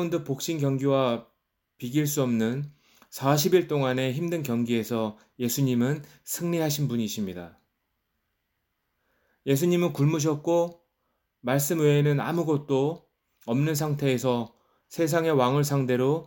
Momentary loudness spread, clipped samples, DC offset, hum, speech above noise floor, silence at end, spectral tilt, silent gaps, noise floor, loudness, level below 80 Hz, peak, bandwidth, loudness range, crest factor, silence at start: 11 LU; under 0.1%; under 0.1%; none; 53 dB; 0 s; -6 dB/octave; none; -78 dBFS; -26 LUFS; -68 dBFS; -8 dBFS; 17 kHz; 5 LU; 18 dB; 0 s